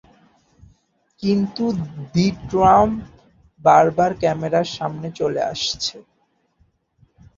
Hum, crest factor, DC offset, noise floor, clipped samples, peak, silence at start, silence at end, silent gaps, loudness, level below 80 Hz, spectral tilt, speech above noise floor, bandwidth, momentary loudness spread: none; 20 dB; under 0.1%; -63 dBFS; under 0.1%; -2 dBFS; 1.2 s; 1.35 s; none; -19 LUFS; -48 dBFS; -5.5 dB/octave; 44 dB; 7.8 kHz; 13 LU